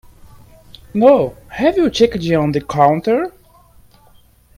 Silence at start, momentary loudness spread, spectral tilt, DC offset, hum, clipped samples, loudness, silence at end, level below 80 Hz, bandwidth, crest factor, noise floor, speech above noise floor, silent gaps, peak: 0.95 s; 9 LU; -6.5 dB/octave; under 0.1%; none; under 0.1%; -15 LUFS; 1.25 s; -44 dBFS; 16 kHz; 16 dB; -49 dBFS; 35 dB; none; 0 dBFS